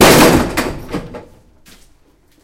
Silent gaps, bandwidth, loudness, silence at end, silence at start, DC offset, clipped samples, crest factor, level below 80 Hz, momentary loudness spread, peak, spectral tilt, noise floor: none; over 20 kHz; -12 LUFS; 1.25 s; 0 s; under 0.1%; 0.3%; 14 dB; -30 dBFS; 25 LU; 0 dBFS; -4 dB/octave; -51 dBFS